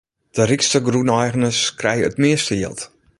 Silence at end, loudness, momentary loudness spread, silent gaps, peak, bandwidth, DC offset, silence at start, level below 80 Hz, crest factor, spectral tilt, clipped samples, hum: 0.35 s; -18 LUFS; 9 LU; none; -2 dBFS; 11.5 kHz; under 0.1%; 0.35 s; -50 dBFS; 16 dB; -4 dB/octave; under 0.1%; none